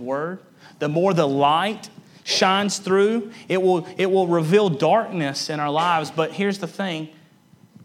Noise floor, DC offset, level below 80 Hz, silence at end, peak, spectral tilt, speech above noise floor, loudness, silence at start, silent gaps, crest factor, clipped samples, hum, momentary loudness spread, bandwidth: -53 dBFS; under 0.1%; -76 dBFS; 0.75 s; -2 dBFS; -5 dB/octave; 33 dB; -21 LUFS; 0 s; none; 18 dB; under 0.1%; none; 10 LU; 15 kHz